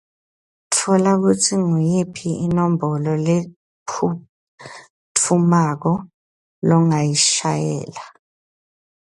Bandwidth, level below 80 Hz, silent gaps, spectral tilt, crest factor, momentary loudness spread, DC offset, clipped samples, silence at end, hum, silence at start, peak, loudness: 11.5 kHz; -58 dBFS; 3.56-3.86 s, 4.29-4.58 s, 4.90-5.15 s, 6.14-6.62 s; -5 dB/octave; 18 dB; 17 LU; under 0.1%; under 0.1%; 1.1 s; none; 0.7 s; -2 dBFS; -18 LUFS